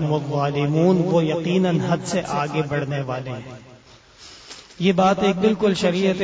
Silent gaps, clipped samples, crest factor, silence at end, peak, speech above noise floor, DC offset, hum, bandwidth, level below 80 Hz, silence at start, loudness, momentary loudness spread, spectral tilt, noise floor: none; under 0.1%; 14 dB; 0 s; -6 dBFS; 28 dB; under 0.1%; none; 8 kHz; -54 dBFS; 0 s; -20 LUFS; 16 LU; -6.5 dB/octave; -48 dBFS